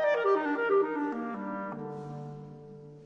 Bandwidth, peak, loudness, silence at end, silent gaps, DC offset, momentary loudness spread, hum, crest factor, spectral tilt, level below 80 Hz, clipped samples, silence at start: 6.8 kHz; -16 dBFS; -31 LUFS; 0 s; none; under 0.1%; 19 LU; none; 14 dB; -7.5 dB/octave; -76 dBFS; under 0.1%; 0 s